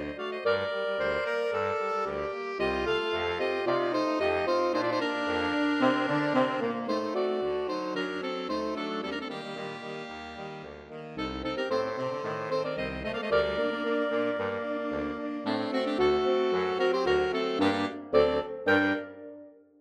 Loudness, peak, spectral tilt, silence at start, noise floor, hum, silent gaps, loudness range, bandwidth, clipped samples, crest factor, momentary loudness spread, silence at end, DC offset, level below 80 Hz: -29 LUFS; -10 dBFS; -5.5 dB/octave; 0 s; -50 dBFS; none; none; 8 LU; 10.5 kHz; under 0.1%; 20 dB; 11 LU; 0.3 s; under 0.1%; -56 dBFS